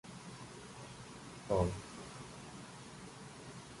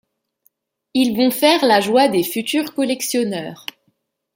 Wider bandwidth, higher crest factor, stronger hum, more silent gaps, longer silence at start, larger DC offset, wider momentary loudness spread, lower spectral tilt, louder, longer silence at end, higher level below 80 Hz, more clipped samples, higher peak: second, 11.5 kHz vs 17 kHz; first, 26 dB vs 18 dB; neither; neither; second, 0.05 s vs 0.95 s; neither; first, 16 LU vs 13 LU; first, -5.5 dB/octave vs -3.5 dB/octave; second, -44 LUFS vs -17 LUFS; second, 0 s vs 0.8 s; first, -56 dBFS vs -66 dBFS; neither; second, -18 dBFS vs -2 dBFS